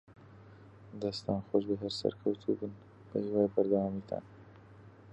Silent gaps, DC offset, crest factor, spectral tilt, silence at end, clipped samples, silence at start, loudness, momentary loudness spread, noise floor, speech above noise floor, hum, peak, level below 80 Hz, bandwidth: none; under 0.1%; 20 dB; -7.5 dB/octave; 0 s; under 0.1%; 0.1 s; -34 LUFS; 13 LU; -55 dBFS; 22 dB; none; -14 dBFS; -64 dBFS; 9.2 kHz